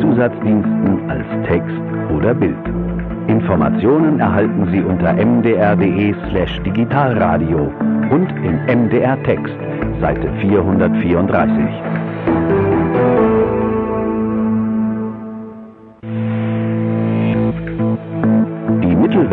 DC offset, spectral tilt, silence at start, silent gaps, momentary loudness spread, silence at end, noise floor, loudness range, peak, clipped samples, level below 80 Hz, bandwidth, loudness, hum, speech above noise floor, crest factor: under 0.1%; -11 dB/octave; 0 s; none; 8 LU; 0 s; -36 dBFS; 5 LU; 0 dBFS; under 0.1%; -34 dBFS; 4.1 kHz; -16 LUFS; none; 22 dB; 14 dB